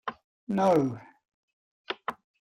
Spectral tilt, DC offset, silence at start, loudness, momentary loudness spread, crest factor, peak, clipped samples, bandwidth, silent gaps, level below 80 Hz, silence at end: -7 dB/octave; under 0.1%; 0.05 s; -29 LUFS; 19 LU; 18 dB; -12 dBFS; under 0.1%; 16 kHz; 0.24-0.47 s, 1.28-1.85 s; -70 dBFS; 0.4 s